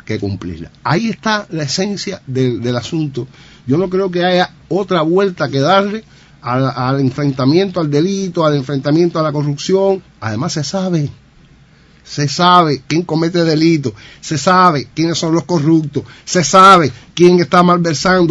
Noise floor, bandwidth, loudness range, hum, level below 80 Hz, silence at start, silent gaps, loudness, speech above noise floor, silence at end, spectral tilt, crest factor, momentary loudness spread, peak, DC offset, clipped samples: -46 dBFS; 11 kHz; 7 LU; none; -48 dBFS; 0.1 s; none; -14 LUFS; 32 dB; 0 s; -5.5 dB/octave; 14 dB; 13 LU; 0 dBFS; under 0.1%; 0.4%